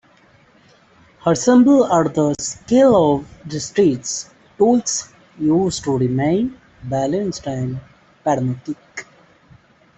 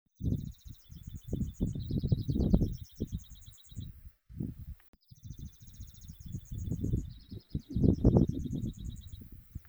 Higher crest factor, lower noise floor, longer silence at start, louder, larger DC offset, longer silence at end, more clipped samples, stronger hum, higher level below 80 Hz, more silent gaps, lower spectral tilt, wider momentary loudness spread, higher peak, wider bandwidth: second, 16 dB vs 24 dB; about the same, -52 dBFS vs -53 dBFS; first, 1.25 s vs 0.2 s; first, -18 LUFS vs -34 LUFS; neither; first, 0.95 s vs 0.1 s; neither; neither; second, -52 dBFS vs -42 dBFS; second, none vs 4.88-4.93 s; second, -5.5 dB/octave vs -9 dB/octave; second, 16 LU vs 22 LU; first, -2 dBFS vs -10 dBFS; second, 8.4 kHz vs over 20 kHz